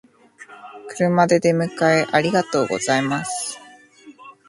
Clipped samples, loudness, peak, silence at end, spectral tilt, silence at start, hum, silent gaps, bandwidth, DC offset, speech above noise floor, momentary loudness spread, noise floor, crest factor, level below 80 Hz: under 0.1%; -19 LUFS; -2 dBFS; 0.15 s; -5 dB/octave; 0.4 s; none; none; 11.5 kHz; under 0.1%; 27 dB; 21 LU; -46 dBFS; 20 dB; -64 dBFS